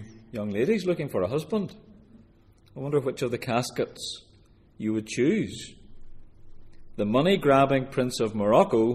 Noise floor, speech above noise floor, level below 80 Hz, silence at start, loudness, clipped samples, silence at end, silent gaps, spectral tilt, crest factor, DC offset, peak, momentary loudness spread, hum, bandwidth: -57 dBFS; 32 dB; -52 dBFS; 0 s; -26 LUFS; under 0.1%; 0 s; none; -6 dB/octave; 22 dB; under 0.1%; -6 dBFS; 17 LU; none; 15 kHz